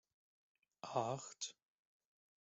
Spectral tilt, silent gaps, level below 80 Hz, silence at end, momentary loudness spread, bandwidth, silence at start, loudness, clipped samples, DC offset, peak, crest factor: -4 dB/octave; none; -88 dBFS; 0.9 s; 8 LU; 8 kHz; 0.85 s; -44 LUFS; under 0.1%; under 0.1%; -22 dBFS; 26 dB